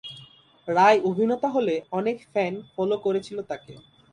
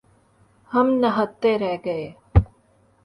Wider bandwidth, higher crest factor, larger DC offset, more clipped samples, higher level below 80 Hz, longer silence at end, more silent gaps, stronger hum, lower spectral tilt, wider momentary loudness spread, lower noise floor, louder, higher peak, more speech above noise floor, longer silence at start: about the same, 10.5 kHz vs 10.5 kHz; about the same, 20 dB vs 22 dB; neither; neither; second, -68 dBFS vs -32 dBFS; second, 0.35 s vs 0.6 s; neither; neither; second, -6 dB/octave vs -9 dB/octave; first, 18 LU vs 10 LU; second, -51 dBFS vs -59 dBFS; about the same, -24 LUFS vs -22 LUFS; second, -6 dBFS vs -2 dBFS; second, 27 dB vs 38 dB; second, 0.05 s vs 0.7 s